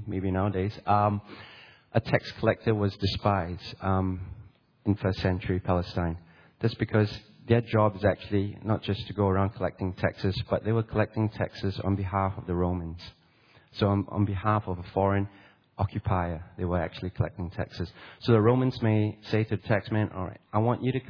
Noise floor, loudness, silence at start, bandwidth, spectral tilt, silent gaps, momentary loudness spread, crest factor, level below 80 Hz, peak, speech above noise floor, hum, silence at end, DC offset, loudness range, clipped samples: -60 dBFS; -28 LUFS; 0 s; 5.4 kHz; -9 dB/octave; none; 10 LU; 22 dB; -50 dBFS; -6 dBFS; 32 dB; none; 0 s; under 0.1%; 3 LU; under 0.1%